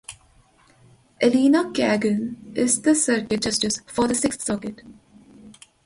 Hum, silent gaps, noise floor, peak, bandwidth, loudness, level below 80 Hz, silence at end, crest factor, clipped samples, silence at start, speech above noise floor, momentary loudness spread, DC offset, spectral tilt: none; none; -57 dBFS; -6 dBFS; 11.5 kHz; -21 LUFS; -56 dBFS; 0.35 s; 18 dB; under 0.1%; 0.1 s; 35 dB; 9 LU; under 0.1%; -3.5 dB/octave